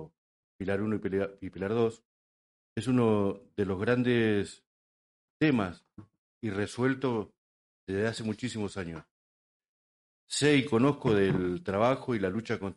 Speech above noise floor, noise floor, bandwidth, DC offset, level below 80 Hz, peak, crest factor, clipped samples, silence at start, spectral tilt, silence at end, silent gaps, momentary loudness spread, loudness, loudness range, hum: over 61 dB; under -90 dBFS; 11.5 kHz; under 0.1%; -62 dBFS; -12 dBFS; 18 dB; under 0.1%; 0 s; -6 dB/octave; 0.05 s; 0.18-0.59 s, 2.05-2.76 s, 4.67-5.40 s, 6.18-6.41 s, 7.38-7.87 s, 9.11-9.60 s, 9.68-10.27 s; 11 LU; -30 LUFS; 5 LU; none